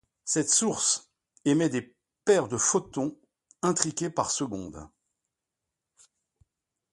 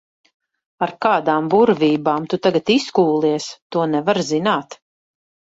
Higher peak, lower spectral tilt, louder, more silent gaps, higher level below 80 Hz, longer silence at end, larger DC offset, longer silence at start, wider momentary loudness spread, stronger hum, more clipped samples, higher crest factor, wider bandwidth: about the same, -2 dBFS vs -2 dBFS; second, -3.5 dB/octave vs -5.5 dB/octave; second, -27 LUFS vs -18 LUFS; second, none vs 3.62-3.70 s; about the same, -62 dBFS vs -62 dBFS; first, 2.05 s vs 0.75 s; neither; second, 0.25 s vs 0.8 s; first, 12 LU vs 8 LU; neither; neither; first, 26 dB vs 16 dB; first, 11.5 kHz vs 8 kHz